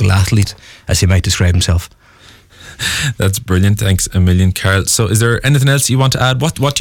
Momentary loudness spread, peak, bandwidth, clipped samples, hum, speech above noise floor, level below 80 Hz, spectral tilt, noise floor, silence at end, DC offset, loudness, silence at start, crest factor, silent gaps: 6 LU; -2 dBFS; 17.5 kHz; under 0.1%; none; 30 dB; -30 dBFS; -4.5 dB/octave; -43 dBFS; 0 s; under 0.1%; -13 LUFS; 0 s; 12 dB; none